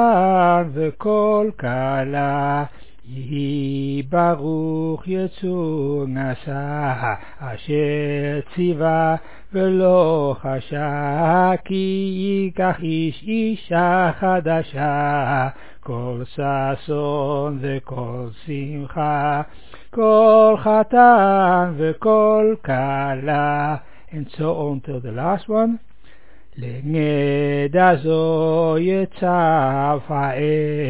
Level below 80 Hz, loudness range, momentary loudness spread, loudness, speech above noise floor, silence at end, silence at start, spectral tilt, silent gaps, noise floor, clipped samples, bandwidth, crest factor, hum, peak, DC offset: -50 dBFS; 9 LU; 13 LU; -19 LUFS; 32 dB; 0 s; 0 s; -11 dB/octave; none; -50 dBFS; under 0.1%; 4 kHz; 18 dB; none; -2 dBFS; 2%